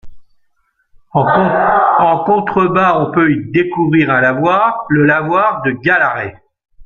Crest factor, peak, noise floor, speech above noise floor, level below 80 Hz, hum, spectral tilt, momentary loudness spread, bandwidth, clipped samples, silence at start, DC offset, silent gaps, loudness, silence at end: 12 dB; 0 dBFS; -61 dBFS; 49 dB; -48 dBFS; none; -8.5 dB/octave; 5 LU; 6.8 kHz; under 0.1%; 0.05 s; under 0.1%; none; -12 LUFS; 0 s